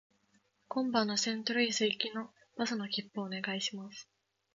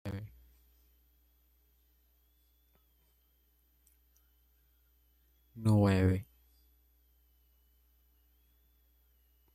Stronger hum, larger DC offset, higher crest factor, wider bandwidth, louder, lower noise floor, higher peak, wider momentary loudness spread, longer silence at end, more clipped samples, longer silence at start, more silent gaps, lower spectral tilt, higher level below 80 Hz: neither; neither; about the same, 20 dB vs 22 dB; second, 7.6 kHz vs 13 kHz; second, -34 LUFS vs -30 LUFS; about the same, -73 dBFS vs -71 dBFS; about the same, -16 dBFS vs -16 dBFS; second, 14 LU vs 19 LU; second, 0.5 s vs 3.3 s; neither; first, 0.7 s vs 0.05 s; neither; second, -2 dB/octave vs -8 dB/octave; second, -82 dBFS vs -64 dBFS